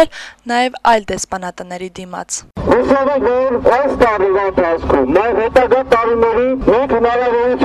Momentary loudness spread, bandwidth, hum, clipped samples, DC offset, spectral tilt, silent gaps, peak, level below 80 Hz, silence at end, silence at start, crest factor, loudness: 12 LU; 12.5 kHz; none; under 0.1%; under 0.1%; -4.5 dB/octave; none; -2 dBFS; -36 dBFS; 0 s; 0 s; 12 dB; -14 LUFS